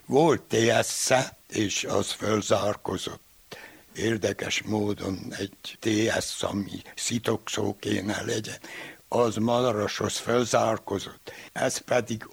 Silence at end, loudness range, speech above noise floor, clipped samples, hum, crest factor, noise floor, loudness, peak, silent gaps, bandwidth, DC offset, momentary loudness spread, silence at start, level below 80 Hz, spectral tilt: 0.05 s; 3 LU; 20 dB; under 0.1%; none; 22 dB; -47 dBFS; -27 LUFS; -6 dBFS; none; over 20 kHz; under 0.1%; 14 LU; 0.1 s; -60 dBFS; -4 dB/octave